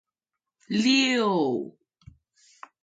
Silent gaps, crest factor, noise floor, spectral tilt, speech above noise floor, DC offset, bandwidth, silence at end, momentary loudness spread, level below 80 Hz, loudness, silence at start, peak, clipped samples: none; 18 dB; -87 dBFS; -4 dB/octave; 64 dB; under 0.1%; 9.2 kHz; 1.15 s; 12 LU; -66 dBFS; -23 LUFS; 0.7 s; -10 dBFS; under 0.1%